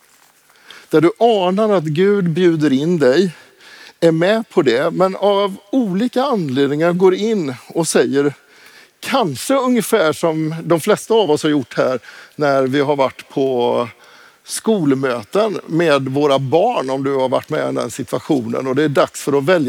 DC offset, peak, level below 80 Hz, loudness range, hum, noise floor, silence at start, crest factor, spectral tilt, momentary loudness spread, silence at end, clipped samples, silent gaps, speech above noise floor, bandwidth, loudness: under 0.1%; -2 dBFS; -68 dBFS; 3 LU; none; -52 dBFS; 0.75 s; 16 dB; -5.5 dB/octave; 6 LU; 0 s; under 0.1%; none; 36 dB; 18 kHz; -16 LUFS